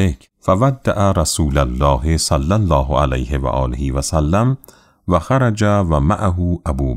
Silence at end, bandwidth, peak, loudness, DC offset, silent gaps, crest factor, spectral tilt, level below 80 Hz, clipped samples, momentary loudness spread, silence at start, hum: 0 s; 15.5 kHz; -2 dBFS; -17 LUFS; under 0.1%; none; 14 dB; -6 dB/octave; -24 dBFS; under 0.1%; 5 LU; 0 s; none